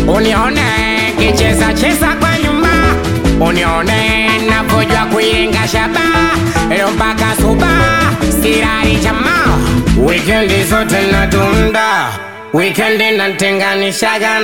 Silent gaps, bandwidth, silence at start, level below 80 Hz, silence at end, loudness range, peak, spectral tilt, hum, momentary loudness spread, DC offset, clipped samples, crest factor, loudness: none; 18 kHz; 0 s; -22 dBFS; 0 s; 1 LU; 0 dBFS; -4.5 dB/octave; none; 2 LU; 1%; under 0.1%; 12 dB; -11 LUFS